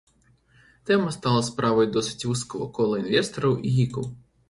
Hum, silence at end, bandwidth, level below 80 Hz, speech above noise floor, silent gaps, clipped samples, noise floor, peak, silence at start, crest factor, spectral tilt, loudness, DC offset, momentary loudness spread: none; 0.35 s; 11.5 kHz; -56 dBFS; 37 dB; none; under 0.1%; -61 dBFS; -6 dBFS; 0.85 s; 18 dB; -5.5 dB/octave; -24 LUFS; under 0.1%; 8 LU